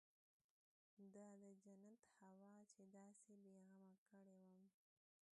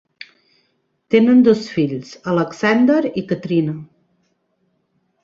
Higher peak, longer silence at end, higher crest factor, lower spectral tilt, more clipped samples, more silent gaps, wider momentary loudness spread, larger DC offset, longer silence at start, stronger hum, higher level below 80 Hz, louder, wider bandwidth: second, -52 dBFS vs -2 dBFS; second, 0.7 s vs 1.4 s; about the same, 16 dB vs 16 dB; about the same, -6 dB/octave vs -7 dB/octave; neither; first, 3.98-4.06 s vs none; second, 5 LU vs 12 LU; neither; second, 0.95 s vs 1.1 s; neither; second, under -90 dBFS vs -60 dBFS; second, -68 LUFS vs -17 LUFS; first, 10.5 kHz vs 7.4 kHz